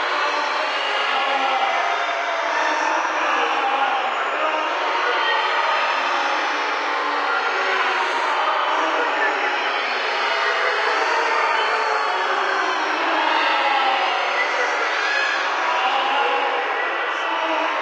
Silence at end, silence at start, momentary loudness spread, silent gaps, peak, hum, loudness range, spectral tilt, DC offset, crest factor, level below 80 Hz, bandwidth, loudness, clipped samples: 0 s; 0 s; 3 LU; none; -6 dBFS; none; 1 LU; 1 dB/octave; under 0.1%; 14 dB; -82 dBFS; 9.6 kHz; -20 LUFS; under 0.1%